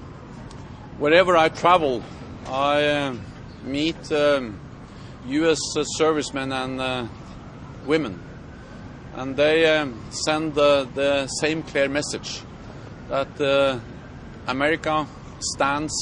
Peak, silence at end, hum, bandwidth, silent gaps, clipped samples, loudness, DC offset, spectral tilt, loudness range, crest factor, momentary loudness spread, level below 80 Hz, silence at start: -4 dBFS; 0 s; none; 10.5 kHz; none; under 0.1%; -22 LUFS; under 0.1%; -4 dB/octave; 4 LU; 20 dB; 22 LU; -48 dBFS; 0 s